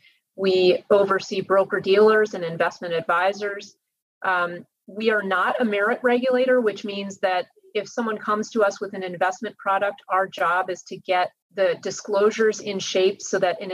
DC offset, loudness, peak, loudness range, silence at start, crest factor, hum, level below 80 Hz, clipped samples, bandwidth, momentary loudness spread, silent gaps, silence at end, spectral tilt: under 0.1%; -22 LUFS; -6 dBFS; 4 LU; 0.4 s; 16 dB; none; -80 dBFS; under 0.1%; 12 kHz; 10 LU; 4.02-4.21 s, 11.42-11.50 s; 0 s; -4 dB/octave